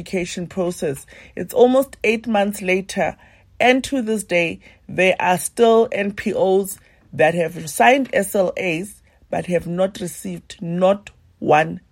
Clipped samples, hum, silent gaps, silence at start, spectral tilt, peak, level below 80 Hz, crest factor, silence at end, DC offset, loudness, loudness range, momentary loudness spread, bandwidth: under 0.1%; none; none; 0 s; -4.5 dB/octave; -2 dBFS; -52 dBFS; 18 dB; 0.15 s; under 0.1%; -19 LUFS; 4 LU; 14 LU; 16.5 kHz